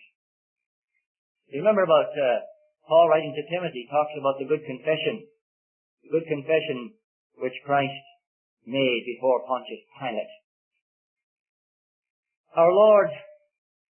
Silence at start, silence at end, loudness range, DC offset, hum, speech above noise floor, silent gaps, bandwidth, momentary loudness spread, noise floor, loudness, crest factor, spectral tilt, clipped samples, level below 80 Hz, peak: 1.55 s; 0.75 s; 6 LU; under 0.1%; none; over 67 dB; 5.41-5.97 s, 7.04-7.30 s, 8.27-8.57 s, 10.44-10.71 s, 10.82-11.16 s, 11.23-12.02 s, 12.10-12.23 s, 12.37-12.44 s; 3.3 kHz; 16 LU; under -90 dBFS; -24 LUFS; 20 dB; -9.5 dB/octave; under 0.1%; -84 dBFS; -6 dBFS